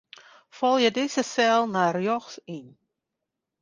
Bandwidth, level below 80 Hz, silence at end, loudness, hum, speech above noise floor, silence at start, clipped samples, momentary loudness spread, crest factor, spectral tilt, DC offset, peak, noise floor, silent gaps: 10 kHz; -74 dBFS; 0.95 s; -24 LUFS; none; 60 dB; 0.55 s; under 0.1%; 17 LU; 18 dB; -4 dB/octave; under 0.1%; -8 dBFS; -84 dBFS; none